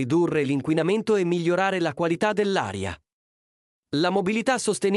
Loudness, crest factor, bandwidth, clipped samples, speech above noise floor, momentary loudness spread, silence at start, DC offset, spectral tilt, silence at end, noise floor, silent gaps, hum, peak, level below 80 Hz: -24 LUFS; 14 dB; 12 kHz; under 0.1%; over 67 dB; 8 LU; 0 s; under 0.1%; -5.5 dB/octave; 0 s; under -90 dBFS; 3.13-3.83 s; none; -10 dBFS; -60 dBFS